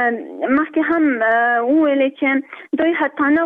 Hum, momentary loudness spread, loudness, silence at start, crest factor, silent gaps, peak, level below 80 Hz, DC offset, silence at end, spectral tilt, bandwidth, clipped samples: none; 5 LU; -17 LUFS; 0 s; 8 dB; none; -8 dBFS; -62 dBFS; under 0.1%; 0 s; -7 dB/octave; 3.8 kHz; under 0.1%